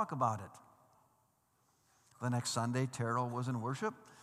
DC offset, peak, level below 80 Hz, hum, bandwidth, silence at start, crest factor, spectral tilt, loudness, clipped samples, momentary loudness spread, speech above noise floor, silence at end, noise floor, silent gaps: under 0.1%; -20 dBFS; -86 dBFS; none; 14.5 kHz; 0 s; 20 dB; -5.5 dB/octave; -37 LUFS; under 0.1%; 7 LU; 38 dB; 0 s; -75 dBFS; none